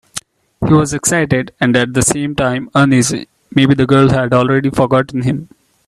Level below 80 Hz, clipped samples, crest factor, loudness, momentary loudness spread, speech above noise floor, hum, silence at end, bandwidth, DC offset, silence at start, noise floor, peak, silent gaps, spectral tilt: -40 dBFS; under 0.1%; 14 dB; -13 LUFS; 9 LU; 19 dB; none; 0.45 s; 13.5 kHz; under 0.1%; 0.15 s; -32 dBFS; 0 dBFS; none; -5 dB/octave